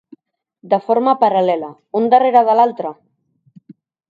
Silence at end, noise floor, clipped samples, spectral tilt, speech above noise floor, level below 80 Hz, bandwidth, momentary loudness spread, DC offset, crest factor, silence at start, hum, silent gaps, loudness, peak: 1.15 s; -60 dBFS; under 0.1%; -7.5 dB/octave; 46 dB; -74 dBFS; 5 kHz; 12 LU; under 0.1%; 16 dB; 0.65 s; none; none; -15 LUFS; 0 dBFS